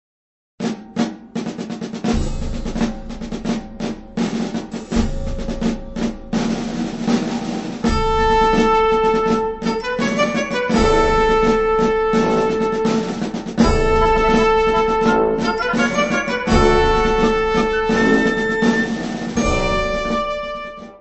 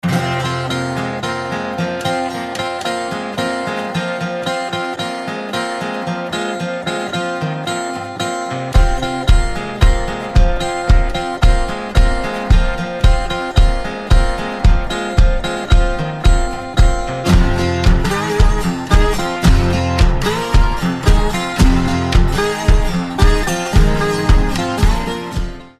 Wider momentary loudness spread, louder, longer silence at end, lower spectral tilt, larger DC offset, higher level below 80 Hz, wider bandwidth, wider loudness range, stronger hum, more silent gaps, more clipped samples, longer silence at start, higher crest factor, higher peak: first, 12 LU vs 6 LU; about the same, -18 LUFS vs -17 LUFS; about the same, 0.05 s vs 0.1 s; about the same, -5.5 dB/octave vs -5.5 dB/octave; neither; second, -28 dBFS vs -16 dBFS; second, 8.4 kHz vs 13.5 kHz; first, 8 LU vs 5 LU; neither; neither; neither; first, 0.6 s vs 0.05 s; about the same, 16 dB vs 14 dB; about the same, -2 dBFS vs 0 dBFS